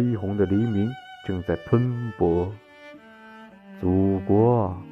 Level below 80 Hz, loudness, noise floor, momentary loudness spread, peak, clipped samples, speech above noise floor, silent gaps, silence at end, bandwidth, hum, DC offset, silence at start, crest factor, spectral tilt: -50 dBFS; -24 LUFS; -46 dBFS; 11 LU; -8 dBFS; under 0.1%; 24 dB; none; 0 s; 5.6 kHz; none; under 0.1%; 0 s; 16 dB; -10.5 dB/octave